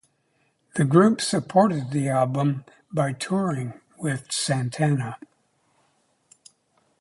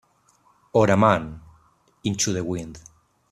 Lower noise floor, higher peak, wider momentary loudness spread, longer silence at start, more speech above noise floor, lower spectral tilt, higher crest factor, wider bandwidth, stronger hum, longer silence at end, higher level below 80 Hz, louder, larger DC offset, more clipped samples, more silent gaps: first, -68 dBFS vs -61 dBFS; about the same, -4 dBFS vs -2 dBFS; second, 13 LU vs 16 LU; about the same, 0.75 s vs 0.75 s; first, 46 dB vs 40 dB; about the same, -5.5 dB/octave vs -5 dB/octave; about the same, 20 dB vs 22 dB; second, 11.5 kHz vs 13.5 kHz; neither; first, 1.85 s vs 0.5 s; second, -64 dBFS vs -54 dBFS; about the same, -24 LUFS vs -22 LUFS; neither; neither; neither